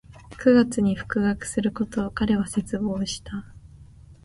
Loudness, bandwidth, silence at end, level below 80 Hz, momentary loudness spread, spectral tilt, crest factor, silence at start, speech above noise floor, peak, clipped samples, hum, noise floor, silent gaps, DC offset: -24 LUFS; 11.5 kHz; 0.1 s; -46 dBFS; 11 LU; -5.5 dB/octave; 18 dB; 0.1 s; 24 dB; -6 dBFS; under 0.1%; none; -47 dBFS; none; under 0.1%